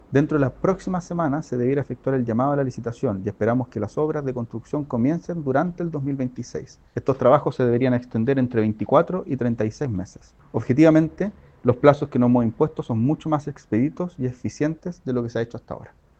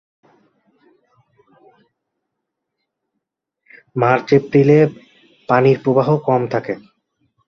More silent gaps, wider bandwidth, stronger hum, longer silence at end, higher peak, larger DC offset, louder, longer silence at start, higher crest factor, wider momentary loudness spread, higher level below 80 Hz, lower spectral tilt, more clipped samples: neither; first, 8.4 kHz vs 6.6 kHz; neither; second, 0.35 s vs 0.7 s; about the same, 0 dBFS vs -2 dBFS; neither; second, -23 LUFS vs -15 LUFS; second, 0.1 s vs 3.95 s; about the same, 22 dB vs 18 dB; about the same, 11 LU vs 11 LU; first, -52 dBFS vs -60 dBFS; about the same, -8.5 dB/octave vs -8.5 dB/octave; neither